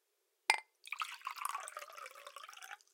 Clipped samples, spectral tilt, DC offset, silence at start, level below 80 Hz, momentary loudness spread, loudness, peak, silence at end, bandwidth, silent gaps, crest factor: under 0.1%; 4.5 dB/octave; under 0.1%; 0.5 s; under -90 dBFS; 17 LU; -41 LUFS; -8 dBFS; 0.15 s; 17 kHz; none; 36 dB